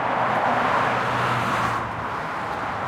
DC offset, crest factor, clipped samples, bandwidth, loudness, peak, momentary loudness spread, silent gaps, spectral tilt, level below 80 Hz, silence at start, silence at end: under 0.1%; 14 dB; under 0.1%; 16.5 kHz; -23 LUFS; -10 dBFS; 7 LU; none; -5 dB/octave; -50 dBFS; 0 s; 0 s